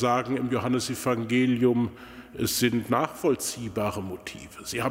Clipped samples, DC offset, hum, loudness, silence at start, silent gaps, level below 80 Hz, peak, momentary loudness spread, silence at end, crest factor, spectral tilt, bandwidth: under 0.1%; under 0.1%; none; -26 LUFS; 0 s; none; -56 dBFS; -10 dBFS; 14 LU; 0 s; 18 dB; -5 dB/octave; 16 kHz